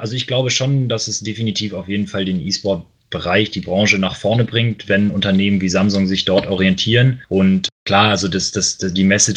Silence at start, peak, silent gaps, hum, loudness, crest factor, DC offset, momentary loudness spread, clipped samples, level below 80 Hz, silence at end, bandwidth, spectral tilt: 0 s; 0 dBFS; 7.72-7.86 s; none; -16 LUFS; 16 dB; under 0.1%; 7 LU; under 0.1%; -48 dBFS; 0 s; 10 kHz; -4.5 dB/octave